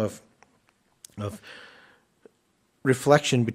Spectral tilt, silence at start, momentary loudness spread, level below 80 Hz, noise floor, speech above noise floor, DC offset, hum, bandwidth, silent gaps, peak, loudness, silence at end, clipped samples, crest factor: -5 dB/octave; 0 s; 26 LU; -66 dBFS; -69 dBFS; 45 dB; under 0.1%; none; 16 kHz; none; -4 dBFS; -24 LUFS; 0 s; under 0.1%; 24 dB